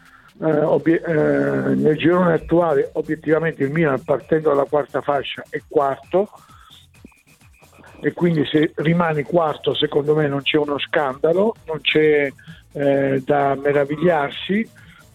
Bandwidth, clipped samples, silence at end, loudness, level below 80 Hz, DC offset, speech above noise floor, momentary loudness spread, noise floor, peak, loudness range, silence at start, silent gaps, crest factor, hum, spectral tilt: 12 kHz; under 0.1%; 0.45 s; -19 LUFS; -52 dBFS; under 0.1%; 33 dB; 6 LU; -51 dBFS; -4 dBFS; 5 LU; 0.4 s; none; 16 dB; none; -7.5 dB/octave